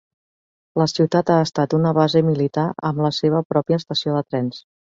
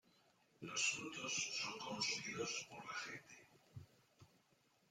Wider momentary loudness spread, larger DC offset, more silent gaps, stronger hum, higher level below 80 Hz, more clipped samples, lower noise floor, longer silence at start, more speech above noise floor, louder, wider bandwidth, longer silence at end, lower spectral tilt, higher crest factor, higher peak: second, 8 LU vs 22 LU; neither; first, 3.45-3.50 s vs none; neither; first, -60 dBFS vs -84 dBFS; neither; first, under -90 dBFS vs -77 dBFS; first, 0.75 s vs 0.6 s; first, over 71 dB vs 31 dB; first, -20 LUFS vs -43 LUFS; second, 7.6 kHz vs 16 kHz; second, 0.35 s vs 0.65 s; first, -7 dB/octave vs -1 dB/octave; second, 16 dB vs 22 dB; first, -4 dBFS vs -26 dBFS